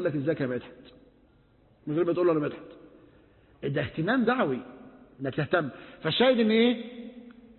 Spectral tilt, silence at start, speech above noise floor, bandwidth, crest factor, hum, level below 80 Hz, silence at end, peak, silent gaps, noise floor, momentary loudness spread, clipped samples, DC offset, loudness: -10 dB/octave; 0 s; 34 dB; 4.3 kHz; 18 dB; none; -62 dBFS; 0.25 s; -10 dBFS; none; -61 dBFS; 20 LU; under 0.1%; under 0.1%; -27 LUFS